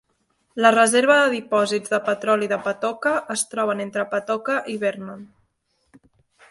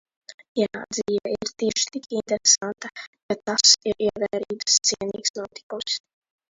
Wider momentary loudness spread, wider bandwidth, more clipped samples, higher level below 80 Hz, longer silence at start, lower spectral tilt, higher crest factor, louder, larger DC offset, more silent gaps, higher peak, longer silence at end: second, 10 LU vs 15 LU; first, 12 kHz vs 8 kHz; neither; second, -70 dBFS vs -62 dBFS; first, 0.55 s vs 0.3 s; first, -3 dB/octave vs -1 dB/octave; about the same, 20 dB vs 22 dB; about the same, -21 LUFS vs -22 LUFS; neither; second, none vs 0.34-0.38 s, 0.48-0.55 s, 3.07-3.13 s, 3.22-3.29 s, 5.30-5.34 s, 5.63-5.70 s; about the same, -2 dBFS vs -2 dBFS; first, 1.25 s vs 0.5 s